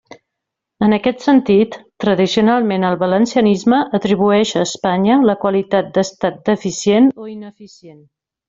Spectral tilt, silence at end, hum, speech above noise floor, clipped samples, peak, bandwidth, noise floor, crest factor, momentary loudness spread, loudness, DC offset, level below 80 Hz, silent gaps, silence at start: -5.5 dB/octave; 0.55 s; none; 65 dB; under 0.1%; -2 dBFS; 7.8 kHz; -80 dBFS; 14 dB; 7 LU; -15 LUFS; under 0.1%; -54 dBFS; none; 0.8 s